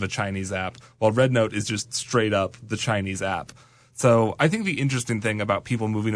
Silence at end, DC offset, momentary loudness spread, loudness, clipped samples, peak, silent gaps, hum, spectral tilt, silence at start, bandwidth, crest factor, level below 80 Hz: 0 s; under 0.1%; 9 LU; -24 LUFS; under 0.1%; -8 dBFS; none; none; -5 dB/octave; 0 s; 11 kHz; 16 dB; -58 dBFS